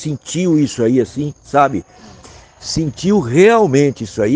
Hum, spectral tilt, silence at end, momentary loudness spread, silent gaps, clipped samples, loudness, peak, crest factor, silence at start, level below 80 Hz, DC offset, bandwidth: none; -6 dB/octave; 0 s; 12 LU; none; under 0.1%; -15 LUFS; 0 dBFS; 14 dB; 0 s; -44 dBFS; under 0.1%; 9.8 kHz